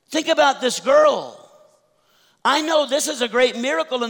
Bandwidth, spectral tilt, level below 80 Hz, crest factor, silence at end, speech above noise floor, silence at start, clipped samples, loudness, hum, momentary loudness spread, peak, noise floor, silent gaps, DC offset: over 20 kHz; -1.5 dB/octave; -68 dBFS; 14 dB; 0 s; 42 dB; 0.1 s; under 0.1%; -18 LUFS; none; 8 LU; -6 dBFS; -60 dBFS; none; under 0.1%